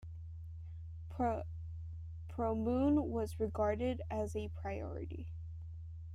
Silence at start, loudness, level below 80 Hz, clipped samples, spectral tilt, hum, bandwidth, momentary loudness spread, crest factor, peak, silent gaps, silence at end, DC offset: 0 s; -39 LUFS; -52 dBFS; under 0.1%; -8.5 dB/octave; none; 12.5 kHz; 15 LU; 16 dB; -22 dBFS; none; 0 s; under 0.1%